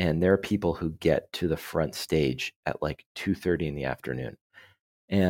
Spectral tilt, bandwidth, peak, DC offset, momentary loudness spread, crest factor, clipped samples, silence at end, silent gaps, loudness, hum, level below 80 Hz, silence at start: -6.5 dB/octave; 17 kHz; -8 dBFS; under 0.1%; 9 LU; 20 dB; under 0.1%; 0 s; 2.56-2.63 s, 3.06-3.15 s, 4.41-4.50 s, 4.81-5.08 s; -29 LUFS; none; -48 dBFS; 0 s